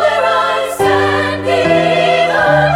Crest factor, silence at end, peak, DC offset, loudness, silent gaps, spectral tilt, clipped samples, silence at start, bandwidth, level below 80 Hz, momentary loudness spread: 12 dB; 0 s; 0 dBFS; under 0.1%; -12 LUFS; none; -5 dB/octave; under 0.1%; 0 s; 16.5 kHz; -42 dBFS; 4 LU